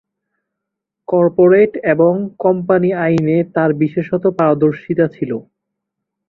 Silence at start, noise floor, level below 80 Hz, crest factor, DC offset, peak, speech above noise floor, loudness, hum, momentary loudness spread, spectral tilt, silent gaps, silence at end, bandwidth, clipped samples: 1.1 s; -80 dBFS; -56 dBFS; 14 dB; under 0.1%; -2 dBFS; 66 dB; -15 LUFS; none; 7 LU; -10 dB/octave; none; 0.9 s; 5.8 kHz; under 0.1%